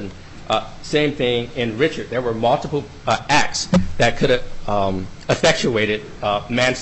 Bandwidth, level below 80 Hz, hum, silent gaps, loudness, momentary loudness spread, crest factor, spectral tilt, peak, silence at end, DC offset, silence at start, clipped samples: 9.6 kHz; -36 dBFS; none; none; -20 LUFS; 7 LU; 14 dB; -4.5 dB/octave; -4 dBFS; 0 s; under 0.1%; 0 s; under 0.1%